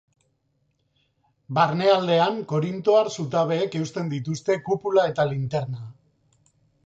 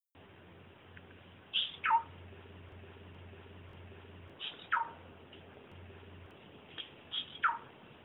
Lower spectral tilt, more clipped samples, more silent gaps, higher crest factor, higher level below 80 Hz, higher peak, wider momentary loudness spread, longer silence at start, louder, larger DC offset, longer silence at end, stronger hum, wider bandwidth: about the same, -6 dB/octave vs -5.5 dB/octave; neither; neither; about the same, 18 dB vs 22 dB; about the same, -66 dBFS vs -70 dBFS; first, -6 dBFS vs -18 dBFS; second, 9 LU vs 23 LU; first, 1.5 s vs 0.15 s; first, -23 LUFS vs -36 LUFS; neither; first, 0.95 s vs 0 s; neither; first, 8.2 kHz vs 5 kHz